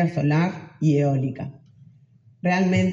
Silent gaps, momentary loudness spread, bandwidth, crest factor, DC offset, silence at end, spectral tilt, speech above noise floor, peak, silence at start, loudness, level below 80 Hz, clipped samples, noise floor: none; 10 LU; 7.6 kHz; 12 dB; under 0.1%; 0 s; -7.5 dB/octave; 34 dB; -10 dBFS; 0 s; -22 LUFS; -60 dBFS; under 0.1%; -54 dBFS